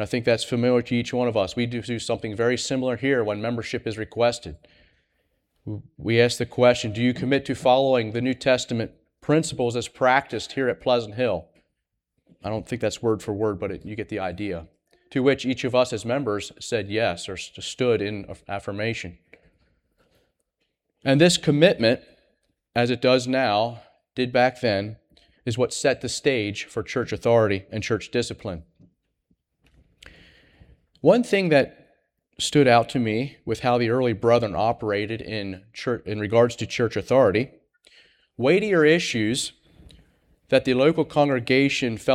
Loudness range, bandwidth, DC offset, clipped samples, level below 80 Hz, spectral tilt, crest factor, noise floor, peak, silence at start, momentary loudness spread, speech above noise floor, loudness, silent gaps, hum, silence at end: 6 LU; 14 kHz; under 0.1%; under 0.1%; -56 dBFS; -5 dB/octave; 20 dB; -79 dBFS; -4 dBFS; 0 s; 13 LU; 57 dB; -23 LUFS; none; none; 0 s